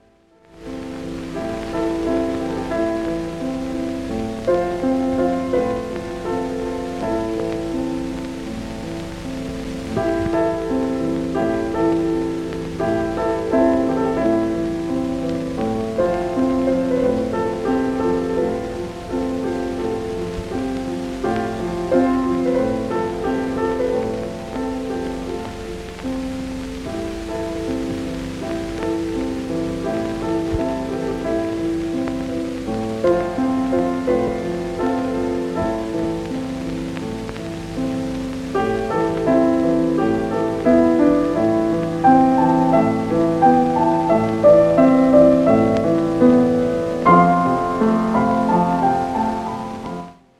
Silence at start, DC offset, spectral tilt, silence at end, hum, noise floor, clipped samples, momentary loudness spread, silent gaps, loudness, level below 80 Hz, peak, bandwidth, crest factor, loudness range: 0.55 s; under 0.1%; -7 dB/octave; 0.25 s; none; -53 dBFS; under 0.1%; 12 LU; none; -20 LUFS; -40 dBFS; 0 dBFS; 13 kHz; 18 dB; 10 LU